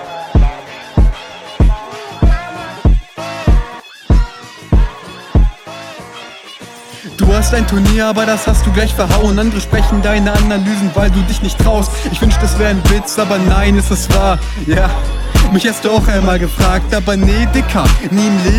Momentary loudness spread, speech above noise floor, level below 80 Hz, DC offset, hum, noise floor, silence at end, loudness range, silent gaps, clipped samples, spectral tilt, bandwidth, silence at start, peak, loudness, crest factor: 16 LU; 22 dB; -14 dBFS; under 0.1%; none; -32 dBFS; 0 s; 5 LU; none; under 0.1%; -5.5 dB/octave; 16 kHz; 0 s; 0 dBFS; -13 LUFS; 12 dB